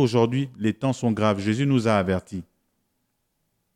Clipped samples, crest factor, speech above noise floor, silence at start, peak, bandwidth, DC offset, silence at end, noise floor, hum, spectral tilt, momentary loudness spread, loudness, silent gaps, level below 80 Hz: under 0.1%; 18 dB; 52 dB; 0 s; -6 dBFS; 12 kHz; under 0.1%; 1.35 s; -74 dBFS; none; -7 dB/octave; 7 LU; -23 LUFS; none; -64 dBFS